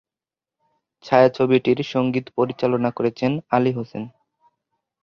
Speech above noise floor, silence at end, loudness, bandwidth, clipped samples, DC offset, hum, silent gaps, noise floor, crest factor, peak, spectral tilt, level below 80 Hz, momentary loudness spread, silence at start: over 70 dB; 0.95 s; -20 LUFS; 6.8 kHz; under 0.1%; under 0.1%; none; none; under -90 dBFS; 20 dB; -2 dBFS; -8 dB/octave; -62 dBFS; 12 LU; 1.05 s